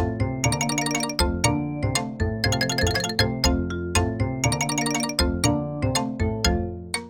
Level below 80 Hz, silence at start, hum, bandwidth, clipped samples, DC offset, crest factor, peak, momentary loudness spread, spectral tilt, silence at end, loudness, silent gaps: -34 dBFS; 0 s; none; 17 kHz; under 0.1%; 0.1%; 18 dB; -6 dBFS; 4 LU; -4 dB/octave; 0 s; -24 LUFS; none